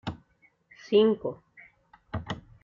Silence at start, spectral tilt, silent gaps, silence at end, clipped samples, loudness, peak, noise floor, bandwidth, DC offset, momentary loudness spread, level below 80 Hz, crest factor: 0.05 s; -5 dB/octave; none; 0.25 s; under 0.1%; -28 LUFS; -10 dBFS; -65 dBFS; 7.2 kHz; under 0.1%; 21 LU; -58 dBFS; 20 dB